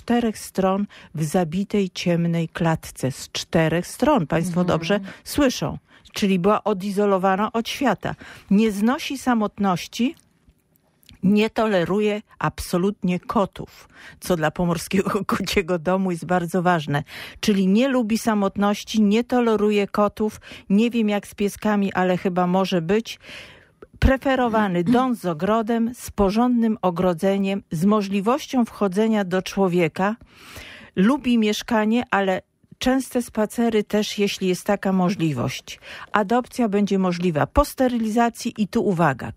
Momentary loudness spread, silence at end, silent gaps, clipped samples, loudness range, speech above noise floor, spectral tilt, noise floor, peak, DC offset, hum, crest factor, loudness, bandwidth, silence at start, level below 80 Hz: 7 LU; 0 s; none; under 0.1%; 3 LU; 42 dB; -6 dB/octave; -63 dBFS; -2 dBFS; under 0.1%; none; 20 dB; -22 LUFS; 16 kHz; 0.05 s; -42 dBFS